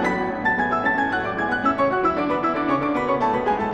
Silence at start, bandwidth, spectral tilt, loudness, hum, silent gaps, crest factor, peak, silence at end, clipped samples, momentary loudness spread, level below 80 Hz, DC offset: 0 s; 9 kHz; -6.5 dB/octave; -21 LUFS; none; none; 14 dB; -8 dBFS; 0 s; under 0.1%; 3 LU; -48 dBFS; 0.1%